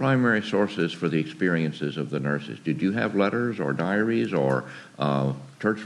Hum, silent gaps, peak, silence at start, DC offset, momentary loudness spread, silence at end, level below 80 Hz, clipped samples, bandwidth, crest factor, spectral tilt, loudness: none; none; -8 dBFS; 0 s; under 0.1%; 6 LU; 0 s; -68 dBFS; under 0.1%; 11.5 kHz; 18 dB; -7.5 dB/octave; -25 LUFS